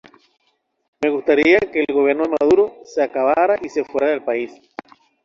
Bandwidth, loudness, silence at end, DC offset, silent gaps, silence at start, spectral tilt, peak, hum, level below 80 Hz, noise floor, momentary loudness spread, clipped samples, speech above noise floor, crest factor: 7.4 kHz; -18 LUFS; 0.7 s; under 0.1%; none; 1 s; -5.5 dB/octave; -2 dBFS; none; -58 dBFS; -39 dBFS; 10 LU; under 0.1%; 21 dB; 16 dB